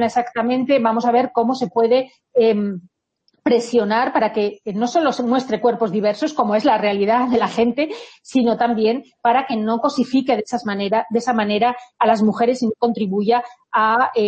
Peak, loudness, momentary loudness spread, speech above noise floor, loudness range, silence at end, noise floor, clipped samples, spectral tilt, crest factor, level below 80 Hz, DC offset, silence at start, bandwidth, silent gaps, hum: -2 dBFS; -18 LUFS; 6 LU; 48 dB; 1 LU; 0 s; -66 dBFS; under 0.1%; -5.5 dB/octave; 16 dB; -60 dBFS; under 0.1%; 0 s; 8.6 kHz; none; none